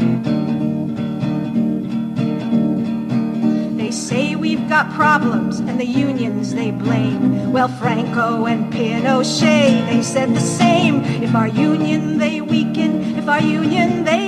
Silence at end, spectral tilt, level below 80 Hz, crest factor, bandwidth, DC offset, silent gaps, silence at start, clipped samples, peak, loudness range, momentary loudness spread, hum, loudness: 0 s; -5.5 dB/octave; -54 dBFS; 14 dB; 11 kHz; under 0.1%; none; 0 s; under 0.1%; -2 dBFS; 4 LU; 6 LU; none; -17 LUFS